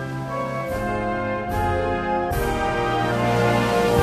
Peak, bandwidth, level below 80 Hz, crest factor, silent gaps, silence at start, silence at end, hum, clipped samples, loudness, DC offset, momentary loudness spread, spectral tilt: -4 dBFS; 15 kHz; -36 dBFS; 18 dB; none; 0 s; 0 s; none; under 0.1%; -23 LUFS; under 0.1%; 7 LU; -6 dB/octave